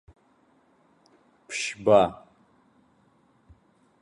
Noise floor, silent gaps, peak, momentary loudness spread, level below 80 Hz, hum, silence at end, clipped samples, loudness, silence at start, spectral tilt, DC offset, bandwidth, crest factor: -63 dBFS; none; -6 dBFS; 17 LU; -62 dBFS; none; 1.9 s; under 0.1%; -24 LUFS; 1.5 s; -4.5 dB/octave; under 0.1%; 11.5 kHz; 24 dB